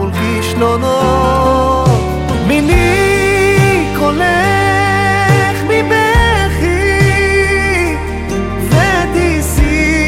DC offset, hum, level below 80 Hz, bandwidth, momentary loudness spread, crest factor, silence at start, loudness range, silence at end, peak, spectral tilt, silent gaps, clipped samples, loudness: under 0.1%; none; -22 dBFS; 16.5 kHz; 5 LU; 10 dB; 0 s; 1 LU; 0 s; 0 dBFS; -5.5 dB/octave; none; under 0.1%; -11 LUFS